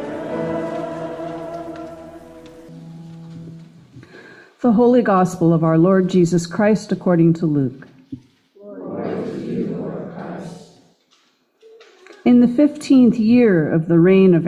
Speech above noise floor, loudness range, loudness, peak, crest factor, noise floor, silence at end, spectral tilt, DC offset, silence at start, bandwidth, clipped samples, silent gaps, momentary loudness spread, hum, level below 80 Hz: 46 dB; 15 LU; -17 LUFS; -4 dBFS; 14 dB; -60 dBFS; 0 s; -8 dB/octave; under 0.1%; 0 s; 11 kHz; under 0.1%; none; 24 LU; none; -56 dBFS